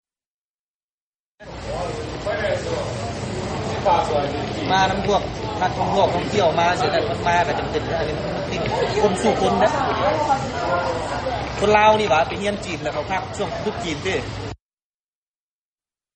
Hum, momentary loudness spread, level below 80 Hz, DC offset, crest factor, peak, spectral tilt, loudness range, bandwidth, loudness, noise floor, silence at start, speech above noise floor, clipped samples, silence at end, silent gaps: none; 9 LU; -40 dBFS; under 0.1%; 18 dB; -2 dBFS; -5 dB/octave; 8 LU; 9 kHz; -21 LUFS; under -90 dBFS; 1.4 s; over 70 dB; under 0.1%; 1.6 s; none